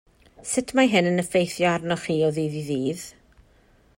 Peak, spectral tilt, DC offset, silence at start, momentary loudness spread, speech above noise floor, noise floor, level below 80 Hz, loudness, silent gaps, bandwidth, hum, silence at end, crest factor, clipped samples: -8 dBFS; -5 dB/octave; under 0.1%; 0.4 s; 11 LU; 35 dB; -58 dBFS; -58 dBFS; -23 LUFS; none; 16.5 kHz; none; 0.9 s; 18 dB; under 0.1%